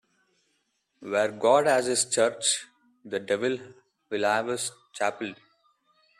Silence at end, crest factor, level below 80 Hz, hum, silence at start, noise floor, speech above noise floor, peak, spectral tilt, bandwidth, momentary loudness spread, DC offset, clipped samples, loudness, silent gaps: 0.85 s; 20 dB; -76 dBFS; none; 1 s; -74 dBFS; 48 dB; -8 dBFS; -2 dB/octave; 13.5 kHz; 13 LU; under 0.1%; under 0.1%; -26 LUFS; none